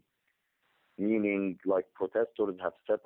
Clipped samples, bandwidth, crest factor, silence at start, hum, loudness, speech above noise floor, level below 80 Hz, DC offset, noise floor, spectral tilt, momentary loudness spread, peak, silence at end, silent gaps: under 0.1%; 3.9 kHz; 16 dB; 1 s; none; -32 LUFS; 48 dB; -76 dBFS; under 0.1%; -79 dBFS; -10 dB/octave; 5 LU; -18 dBFS; 0.05 s; none